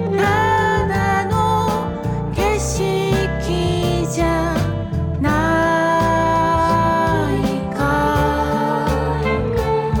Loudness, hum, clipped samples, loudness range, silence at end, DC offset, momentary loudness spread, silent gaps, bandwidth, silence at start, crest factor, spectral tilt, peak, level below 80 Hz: -18 LUFS; none; under 0.1%; 2 LU; 0 s; under 0.1%; 5 LU; none; 19 kHz; 0 s; 10 dB; -6 dB/octave; -8 dBFS; -30 dBFS